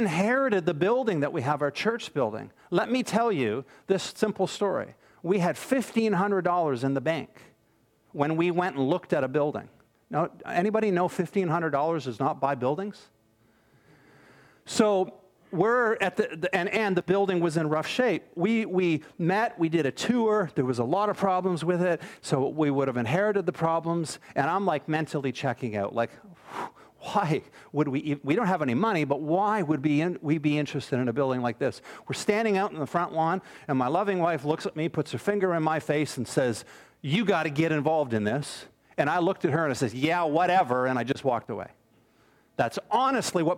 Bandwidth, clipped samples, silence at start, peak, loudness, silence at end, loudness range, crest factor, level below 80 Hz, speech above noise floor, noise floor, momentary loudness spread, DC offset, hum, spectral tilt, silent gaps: 16 kHz; under 0.1%; 0 s; -8 dBFS; -27 LUFS; 0 s; 3 LU; 18 dB; -70 dBFS; 40 dB; -66 dBFS; 7 LU; under 0.1%; none; -6 dB/octave; none